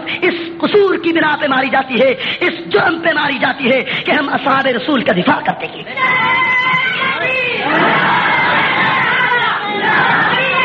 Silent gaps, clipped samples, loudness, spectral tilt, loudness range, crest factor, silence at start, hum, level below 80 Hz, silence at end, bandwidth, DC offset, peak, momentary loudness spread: none; under 0.1%; -13 LUFS; -1.5 dB/octave; 2 LU; 14 dB; 0 s; none; -56 dBFS; 0 s; 7.6 kHz; under 0.1%; 0 dBFS; 4 LU